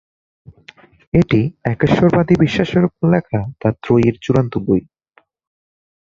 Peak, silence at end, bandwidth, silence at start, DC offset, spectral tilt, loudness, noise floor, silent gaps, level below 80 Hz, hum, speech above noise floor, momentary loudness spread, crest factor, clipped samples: -2 dBFS; 1.3 s; 7.4 kHz; 1.15 s; under 0.1%; -8.5 dB/octave; -16 LUFS; -57 dBFS; none; -42 dBFS; none; 42 dB; 6 LU; 16 dB; under 0.1%